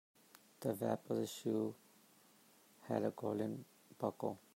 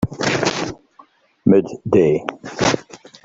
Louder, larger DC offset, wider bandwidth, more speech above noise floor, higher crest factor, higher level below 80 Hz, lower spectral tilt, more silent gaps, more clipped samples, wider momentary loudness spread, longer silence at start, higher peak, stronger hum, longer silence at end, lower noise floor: second, -42 LUFS vs -19 LUFS; neither; first, 16 kHz vs 8 kHz; second, 28 dB vs 33 dB; about the same, 22 dB vs 18 dB; second, -86 dBFS vs -50 dBFS; first, -6.5 dB/octave vs -5 dB/octave; neither; neither; about the same, 11 LU vs 10 LU; first, 0.6 s vs 0 s; second, -22 dBFS vs -2 dBFS; neither; second, 0.15 s vs 0.3 s; first, -68 dBFS vs -51 dBFS